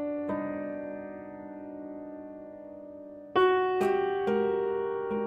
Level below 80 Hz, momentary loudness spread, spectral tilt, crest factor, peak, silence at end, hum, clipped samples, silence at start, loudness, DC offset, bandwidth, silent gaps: -68 dBFS; 19 LU; -6.5 dB/octave; 18 dB; -14 dBFS; 0 s; none; under 0.1%; 0 s; -29 LUFS; under 0.1%; 8.6 kHz; none